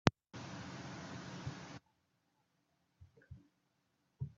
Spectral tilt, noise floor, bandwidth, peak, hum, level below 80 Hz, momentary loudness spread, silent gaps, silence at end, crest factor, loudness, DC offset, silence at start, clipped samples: -5 dB/octave; -81 dBFS; 7.8 kHz; -4 dBFS; none; -66 dBFS; 16 LU; none; 0.05 s; 40 dB; -46 LUFS; under 0.1%; 0.05 s; under 0.1%